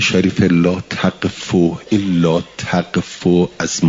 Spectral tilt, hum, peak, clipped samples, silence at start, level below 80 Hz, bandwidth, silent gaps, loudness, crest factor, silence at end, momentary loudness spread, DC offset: -5.5 dB/octave; none; -2 dBFS; under 0.1%; 0 s; -48 dBFS; 7.8 kHz; none; -16 LUFS; 14 dB; 0 s; 6 LU; under 0.1%